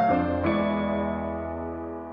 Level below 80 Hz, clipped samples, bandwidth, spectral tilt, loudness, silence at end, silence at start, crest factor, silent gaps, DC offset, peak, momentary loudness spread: -46 dBFS; under 0.1%; 5.4 kHz; -10 dB/octave; -27 LUFS; 0 s; 0 s; 14 dB; none; under 0.1%; -12 dBFS; 9 LU